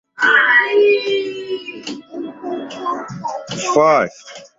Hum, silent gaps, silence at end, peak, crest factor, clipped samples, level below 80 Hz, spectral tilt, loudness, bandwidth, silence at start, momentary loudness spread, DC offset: none; none; 0.1 s; -2 dBFS; 16 dB; under 0.1%; -62 dBFS; -3.5 dB/octave; -16 LUFS; 8 kHz; 0.2 s; 17 LU; under 0.1%